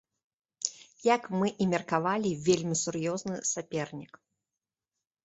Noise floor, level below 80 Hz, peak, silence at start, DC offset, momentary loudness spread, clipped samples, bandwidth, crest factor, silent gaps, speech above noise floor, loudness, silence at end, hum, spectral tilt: under -90 dBFS; -68 dBFS; -8 dBFS; 0.6 s; under 0.1%; 8 LU; under 0.1%; 8.2 kHz; 24 dB; none; over 60 dB; -30 LUFS; 1.2 s; none; -4.5 dB/octave